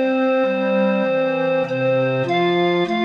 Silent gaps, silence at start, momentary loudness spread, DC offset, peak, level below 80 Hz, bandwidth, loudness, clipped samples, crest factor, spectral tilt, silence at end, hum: none; 0 s; 2 LU; under 0.1%; -8 dBFS; -68 dBFS; 6.8 kHz; -19 LUFS; under 0.1%; 10 dB; -7.5 dB/octave; 0 s; none